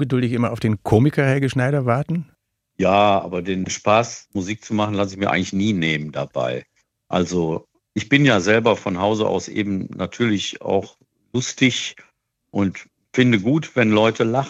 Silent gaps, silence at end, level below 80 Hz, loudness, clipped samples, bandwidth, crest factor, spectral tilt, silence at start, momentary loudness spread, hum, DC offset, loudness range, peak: none; 0 s; -56 dBFS; -20 LUFS; under 0.1%; 11 kHz; 18 dB; -5.5 dB/octave; 0 s; 11 LU; none; under 0.1%; 4 LU; -2 dBFS